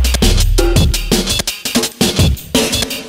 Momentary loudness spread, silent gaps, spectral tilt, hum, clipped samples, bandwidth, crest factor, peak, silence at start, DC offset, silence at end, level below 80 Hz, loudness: 3 LU; none; -4 dB/octave; none; under 0.1%; 16.5 kHz; 12 dB; 0 dBFS; 0 s; under 0.1%; 0 s; -18 dBFS; -14 LUFS